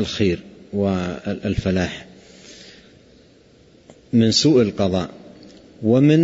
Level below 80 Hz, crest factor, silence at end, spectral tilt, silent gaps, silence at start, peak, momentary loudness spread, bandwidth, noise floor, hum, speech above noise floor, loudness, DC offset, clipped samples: -44 dBFS; 16 dB; 0 s; -6 dB/octave; none; 0 s; -4 dBFS; 18 LU; 8 kHz; -51 dBFS; none; 33 dB; -20 LUFS; under 0.1%; under 0.1%